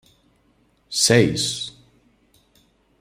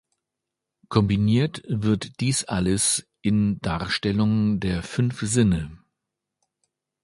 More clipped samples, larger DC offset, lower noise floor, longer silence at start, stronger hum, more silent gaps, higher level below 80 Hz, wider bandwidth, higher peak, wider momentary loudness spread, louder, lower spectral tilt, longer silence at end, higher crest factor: neither; neither; second, -62 dBFS vs -85 dBFS; about the same, 0.9 s vs 0.9 s; neither; neither; second, -56 dBFS vs -44 dBFS; first, 16 kHz vs 11.5 kHz; about the same, -2 dBFS vs -4 dBFS; first, 14 LU vs 6 LU; first, -19 LUFS vs -23 LUFS; second, -3.5 dB/octave vs -5 dB/octave; about the same, 1.3 s vs 1.3 s; about the same, 22 dB vs 20 dB